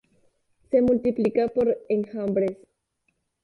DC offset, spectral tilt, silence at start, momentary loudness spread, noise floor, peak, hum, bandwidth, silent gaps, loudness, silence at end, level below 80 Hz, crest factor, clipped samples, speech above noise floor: under 0.1%; -9 dB/octave; 0.7 s; 6 LU; -74 dBFS; -10 dBFS; none; 5 kHz; none; -24 LUFS; 0.9 s; -58 dBFS; 16 dB; under 0.1%; 51 dB